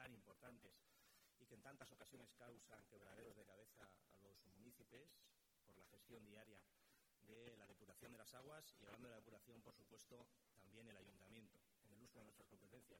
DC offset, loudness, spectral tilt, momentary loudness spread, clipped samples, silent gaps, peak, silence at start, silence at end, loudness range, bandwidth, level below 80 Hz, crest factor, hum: under 0.1%; -66 LUFS; -4 dB/octave; 6 LU; under 0.1%; none; -46 dBFS; 0 s; 0 s; 4 LU; 18 kHz; -86 dBFS; 22 dB; none